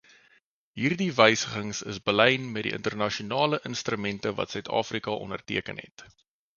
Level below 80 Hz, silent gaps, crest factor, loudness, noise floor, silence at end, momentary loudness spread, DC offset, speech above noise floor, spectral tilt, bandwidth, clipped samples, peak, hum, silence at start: -62 dBFS; 5.91-5.97 s; 26 dB; -27 LUFS; -65 dBFS; 0.55 s; 12 LU; under 0.1%; 38 dB; -4 dB/octave; 7.4 kHz; under 0.1%; -2 dBFS; none; 0.75 s